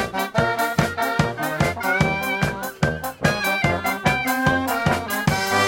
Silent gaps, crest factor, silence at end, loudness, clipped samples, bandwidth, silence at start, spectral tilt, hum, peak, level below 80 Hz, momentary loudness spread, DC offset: none; 18 dB; 0 s; -21 LUFS; under 0.1%; 17 kHz; 0 s; -4.5 dB/octave; none; -2 dBFS; -42 dBFS; 3 LU; under 0.1%